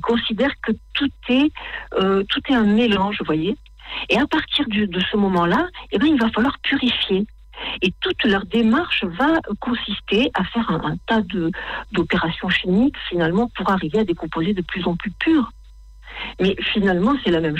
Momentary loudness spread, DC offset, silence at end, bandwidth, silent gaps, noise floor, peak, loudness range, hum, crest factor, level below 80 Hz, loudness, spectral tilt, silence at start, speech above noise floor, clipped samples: 7 LU; under 0.1%; 0 s; 8.6 kHz; none; -42 dBFS; -6 dBFS; 2 LU; none; 14 dB; -42 dBFS; -20 LUFS; -6.5 dB/octave; 0 s; 22 dB; under 0.1%